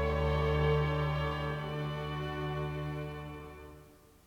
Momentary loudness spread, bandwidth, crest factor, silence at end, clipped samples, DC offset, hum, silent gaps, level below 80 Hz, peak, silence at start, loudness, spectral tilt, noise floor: 16 LU; 9.4 kHz; 16 dB; 0.3 s; under 0.1%; under 0.1%; none; none; -44 dBFS; -18 dBFS; 0 s; -34 LUFS; -7.5 dB/octave; -57 dBFS